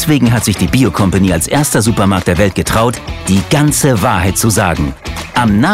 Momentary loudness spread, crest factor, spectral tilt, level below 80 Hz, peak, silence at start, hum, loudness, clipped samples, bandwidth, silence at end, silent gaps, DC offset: 5 LU; 12 dB; -5 dB/octave; -28 dBFS; 0 dBFS; 0 s; none; -12 LUFS; under 0.1%; 16.5 kHz; 0 s; none; under 0.1%